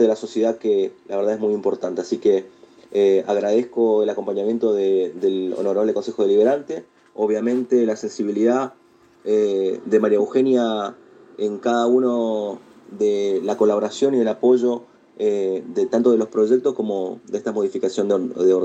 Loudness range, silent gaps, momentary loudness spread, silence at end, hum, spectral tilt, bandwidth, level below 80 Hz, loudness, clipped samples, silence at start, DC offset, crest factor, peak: 2 LU; none; 8 LU; 0 s; none; -6 dB/octave; 8.2 kHz; -74 dBFS; -20 LUFS; under 0.1%; 0 s; under 0.1%; 16 dB; -4 dBFS